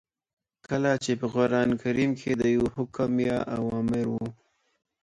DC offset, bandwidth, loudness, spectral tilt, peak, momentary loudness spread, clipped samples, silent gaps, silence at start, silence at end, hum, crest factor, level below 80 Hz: under 0.1%; 10.5 kHz; -27 LUFS; -6.5 dB/octave; -10 dBFS; 6 LU; under 0.1%; none; 0.7 s; 0.7 s; none; 16 dB; -56 dBFS